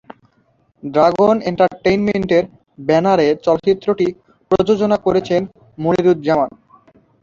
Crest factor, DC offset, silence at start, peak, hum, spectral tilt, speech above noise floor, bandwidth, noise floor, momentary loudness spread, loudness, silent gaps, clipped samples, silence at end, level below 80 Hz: 16 dB; under 0.1%; 0.85 s; -2 dBFS; none; -7 dB/octave; 44 dB; 7.4 kHz; -59 dBFS; 8 LU; -16 LUFS; none; under 0.1%; 0.75 s; -50 dBFS